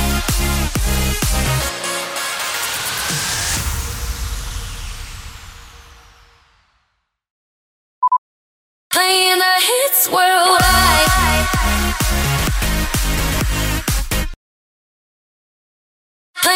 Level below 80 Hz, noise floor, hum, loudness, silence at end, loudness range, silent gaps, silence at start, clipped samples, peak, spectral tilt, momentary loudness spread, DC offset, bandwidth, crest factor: -24 dBFS; -69 dBFS; none; -16 LUFS; 0 s; 15 LU; 7.30-8.02 s, 8.18-8.90 s, 14.36-16.34 s; 0 s; under 0.1%; -2 dBFS; -2.5 dB/octave; 15 LU; under 0.1%; over 20 kHz; 16 dB